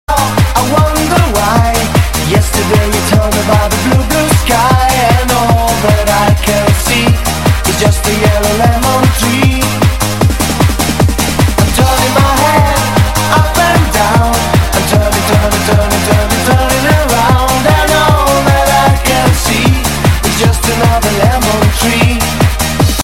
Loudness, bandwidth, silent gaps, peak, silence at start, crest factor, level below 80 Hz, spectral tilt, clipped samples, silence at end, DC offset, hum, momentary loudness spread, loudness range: -10 LUFS; 17 kHz; none; 0 dBFS; 0.1 s; 10 dB; -18 dBFS; -4.5 dB/octave; under 0.1%; 0 s; under 0.1%; none; 2 LU; 1 LU